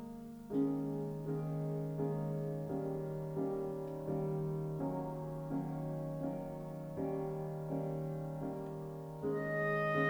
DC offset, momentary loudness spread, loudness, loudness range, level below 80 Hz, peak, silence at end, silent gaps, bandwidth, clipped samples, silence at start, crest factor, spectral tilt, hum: under 0.1%; 7 LU; -40 LUFS; 2 LU; -62 dBFS; -22 dBFS; 0 s; none; over 20 kHz; under 0.1%; 0 s; 16 dB; -8.5 dB/octave; none